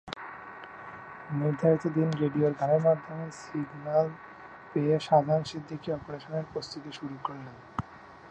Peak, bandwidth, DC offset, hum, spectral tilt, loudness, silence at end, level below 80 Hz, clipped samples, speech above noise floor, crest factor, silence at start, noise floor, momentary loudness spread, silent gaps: -10 dBFS; 9.2 kHz; under 0.1%; none; -7.5 dB/octave; -30 LUFS; 0 s; -62 dBFS; under 0.1%; 19 dB; 20 dB; 0.05 s; -48 dBFS; 19 LU; none